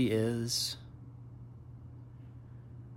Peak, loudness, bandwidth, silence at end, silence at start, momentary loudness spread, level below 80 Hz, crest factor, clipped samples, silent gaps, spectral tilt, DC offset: -20 dBFS; -33 LUFS; 16.5 kHz; 0 s; 0 s; 19 LU; -62 dBFS; 18 dB; under 0.1%; none; -4.5 dB/octave; under 0.1%